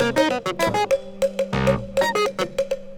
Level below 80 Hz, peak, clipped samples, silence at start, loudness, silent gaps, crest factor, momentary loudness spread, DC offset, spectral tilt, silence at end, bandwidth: -44 dBFS; -6 dBFS; under 0.1%; 0 s; -22 LUFS; none; 16 dB; 5 LU; under 0.1%; -5 dB/octave; 0 s; 20 kHz